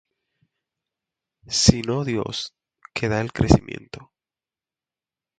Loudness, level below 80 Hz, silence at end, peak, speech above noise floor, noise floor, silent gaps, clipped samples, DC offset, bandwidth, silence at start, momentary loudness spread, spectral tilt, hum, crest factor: -21 LUFS; -38 dBFS; 1.35 s; 0 dBFS; over 69 dB; under -90 dBFS; none; under 0.1%; under 0.1%; 9.4 kHz; 1.5 s; 19 LU; -4.5 dB/octave; none; 24 dB